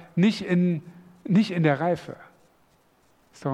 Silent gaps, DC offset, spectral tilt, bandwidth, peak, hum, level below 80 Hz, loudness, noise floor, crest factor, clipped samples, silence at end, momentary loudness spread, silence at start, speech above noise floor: none; under 0.1%; -7.5 dB/octave; 9.6 kHz; -6 dBFS; none; -68 dBFS; -24 LUFS; -62 dBFS; 20 dB; under 0.1%; 0 s; 19 LU; 0 s; 39 dB